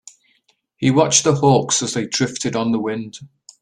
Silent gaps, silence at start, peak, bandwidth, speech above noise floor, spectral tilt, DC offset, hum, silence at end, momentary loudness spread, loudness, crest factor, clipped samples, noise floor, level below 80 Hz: none; 0.8 s; 0 dBFS; 11 kHz; 45 dB; -4 dB/octave; under 0.1%; none; 0.35 s; 13 LU; -17 LUFS; 18 dB; under 0.1%; -63 dBFS; -56 dBFS